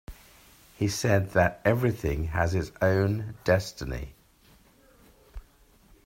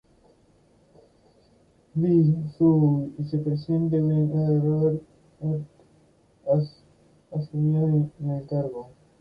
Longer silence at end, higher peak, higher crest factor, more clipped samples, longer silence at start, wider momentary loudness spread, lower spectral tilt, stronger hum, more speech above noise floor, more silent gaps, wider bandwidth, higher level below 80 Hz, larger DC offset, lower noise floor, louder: first, 0.65 s vs 0.35 s; about the same, -8 dBFS vs -10 dBFS; first, 20 dB vs 14 dB; neither; second, 0.1 s vs 1.95 s; about the same, 12 LU vs 13 LU; second, -6 dB/octave vs -12 dB/octave; neither; second, 33 dB vs 37 dB; neither; first, 16 kHz vs 4.9 kHz; first, -44 dBFS vs -60 dBFS; neither; about the same, -59 dBFS vs -60 dBFS; second, -27 LUFS vs -24 LUFS